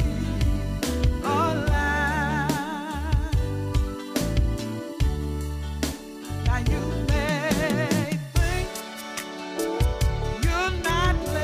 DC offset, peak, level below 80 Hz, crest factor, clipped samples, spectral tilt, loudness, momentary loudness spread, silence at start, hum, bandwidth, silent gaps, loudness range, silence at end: under 0.1%; -10 dBFS; -28 dBFS; 16 dB; under 0.1%; -5.5 dB/octave; -26 LUFS; 8 LU; 0 s; none; 15.5 kHz; none; 3 LU; 0 s